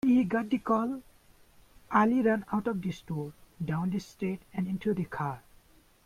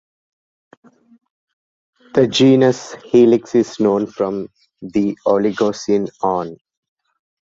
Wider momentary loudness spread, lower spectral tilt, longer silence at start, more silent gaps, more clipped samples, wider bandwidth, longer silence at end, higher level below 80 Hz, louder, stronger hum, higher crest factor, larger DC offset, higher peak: about the same, 12 LU vs 13 LU; first, -8 dB/octave vs -6 dB/octave; second, 0.05 s vs 2.15 s; neither; neither; first, 15 kHz vs 7.8 kHz; second, 0.65 s vs 0.9 s; about the same, -62 dBFS vs -58 dBFS; second, -30 LUFS vs -16 LUFS; neither; about the same, 18 dB vs 16 dB; neither; second, -12 dBFS vs -2 dBFS